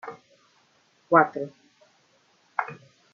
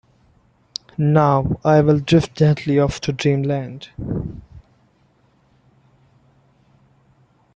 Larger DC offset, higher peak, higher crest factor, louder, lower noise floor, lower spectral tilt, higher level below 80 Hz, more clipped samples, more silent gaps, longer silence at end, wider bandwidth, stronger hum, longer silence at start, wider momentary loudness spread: neither; about the same, -4 dBFS vs -2 dBFS; first, 26 dB vs 18 dB; second, -24 LUFS vs -18 LUFS; first, -64 dBFS vs -58 dBFS; second, -5.5 dB/octave vs -7.5 dB/octave; second, -80 dBFS vs -44 dBFS; neither; neither; second, 0.4 s vs 2.95 s; second, 7.2 kHz vs 8.2 kHz; neither; second, 0.05 s vs 1 s; first, 21 LU vs 18 LU